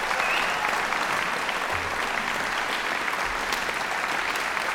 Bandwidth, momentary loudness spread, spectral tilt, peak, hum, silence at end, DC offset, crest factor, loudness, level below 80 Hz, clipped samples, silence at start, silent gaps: 18 kHz; 3 LU; -1.5 dB/octave; -8 dBFS; none; 0 s; under 0.1%; 20 dB; -25 LUFS; -52 dBFS; under 0.1%; 0 s; none